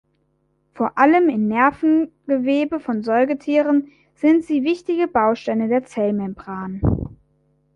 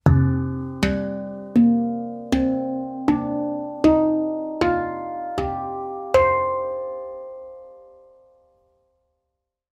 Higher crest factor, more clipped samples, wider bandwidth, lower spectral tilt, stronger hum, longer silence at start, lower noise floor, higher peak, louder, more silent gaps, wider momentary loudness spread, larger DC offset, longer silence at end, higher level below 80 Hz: about the same, 18 dB vs 20 dB; neither; second, 9 kHz vs 12.5 kHz; about the same, -8 dB/octave vs -8 dB/octave; neither; first, 0.75 s vs 0.05 s; second, -66 dBFS vs -80 dBFS; about the same, -2 dBFS vs -4 dBFS; first, -19 LUFS vs -22 LUFS; neither; second, 9 LU vs 14 LU; neither; second, 0.6 s vs 1.9 s; about the same, -42 dBFS vs -40 dBFS